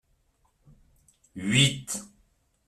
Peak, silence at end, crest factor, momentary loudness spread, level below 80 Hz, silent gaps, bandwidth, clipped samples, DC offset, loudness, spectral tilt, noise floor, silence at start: -8 dBFS; 0.6 s; 22 dB; 15 LU; -60 dBFS; none; 14 kHz; under 0.1%; under 0.1%; -25 LUFS; -3.5 dB/octave; -69 dBFS; 1.35 s